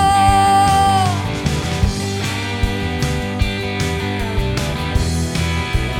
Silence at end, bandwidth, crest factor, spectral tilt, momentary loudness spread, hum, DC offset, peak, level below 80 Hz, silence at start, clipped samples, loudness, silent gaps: 0 s; 17 kHz; 16 dB; -5 dB/octave; 8 LU; none; under 0.1%; -2 dBFS; -26 dBFS; 0 s; under 0.1%; -18 LUFS; none